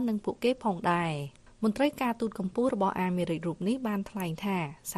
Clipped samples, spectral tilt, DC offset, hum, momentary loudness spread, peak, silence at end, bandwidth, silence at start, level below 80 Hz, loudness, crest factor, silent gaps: under 0.1%; -6 dB/octave; under 0.1%; none; 5 LU; -14 dBFS; 0 s; 13 kHz; 0 s; -60 dBFS; -30 LUFS; 16 dB; none